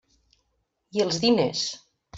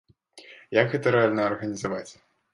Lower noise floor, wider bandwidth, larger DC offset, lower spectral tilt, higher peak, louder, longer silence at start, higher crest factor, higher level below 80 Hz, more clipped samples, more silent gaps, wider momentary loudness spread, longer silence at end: first, -75 dBFS vs -51 dBFS; second, 8 kHz vs 11 kHz; neither; second, -4 dB/octave vs -6 dB/octave; about the same, -8 dBFS vs -6 dBFS; about the same, -24 LUFS vs -25 LUFS; first, 0.95 s vs 0.35 s; about the same, 18 dB vs 22 dB; about the same, -64 dBFS vs -64 dBFS; neither; neither; about the same, 11 LU vs 12 LU; second, 0 s vs 0.4 s